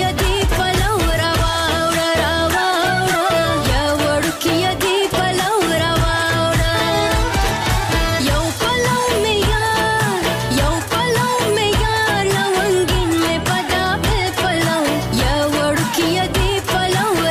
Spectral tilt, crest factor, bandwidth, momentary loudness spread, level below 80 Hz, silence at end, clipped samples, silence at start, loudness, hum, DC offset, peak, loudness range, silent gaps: -4 dB/octave; 10 dB; 15.5 kHz; 2 LU; -26 dBFS; 0 s; under 0.1%; 0 s; -17 LUFS; none; under 0.1%; -6 dBFS; 1 LU; none